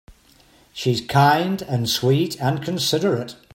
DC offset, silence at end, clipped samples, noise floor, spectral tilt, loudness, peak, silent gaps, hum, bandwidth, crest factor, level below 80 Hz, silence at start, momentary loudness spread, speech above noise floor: under 0.1%; 0.2 s; under 0.1%; -54 dBFS; -5 dB/octave; -20 LUFS; -4 dBFS; none; none; 16.5 kHz; 18 dB; -56 dBFS; 0.75 s; 8 LU; 34 dB